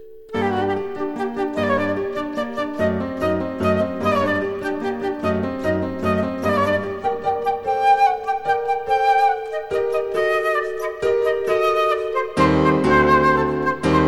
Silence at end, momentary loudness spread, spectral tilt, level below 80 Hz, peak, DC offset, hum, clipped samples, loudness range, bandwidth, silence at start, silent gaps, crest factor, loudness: 0 s; 9 LU; -6.5 dB/octave; -44 dBFS; -4 dBFS; under 0.1%; none; under 0.1%; 4 LU; 16 kHz; 0 s; none; 16 dB; -20 LUFS